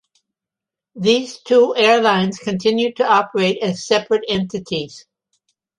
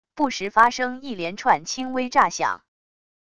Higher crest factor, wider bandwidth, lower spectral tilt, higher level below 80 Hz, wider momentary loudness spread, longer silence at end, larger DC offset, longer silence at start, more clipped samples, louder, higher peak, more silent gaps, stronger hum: second, 16 dB vs 22 dB; about the same, 11 kHz vs 11 kHz; first, -4.5 dB/octave vs -2.5 dB/octave; about the same, -58 dBFS vs -60 dBFS; about the same, 10 LU vs 11 LU; about the same, 0.8 s vs 0.8 s; second, under 0.1% vs 0.5%; first, 0.95 s vs 0.15 s; neither; first, -17 LUFS vs -22 LUFS; about the same, -2 dBFS vs -2 dBFS; neither; neither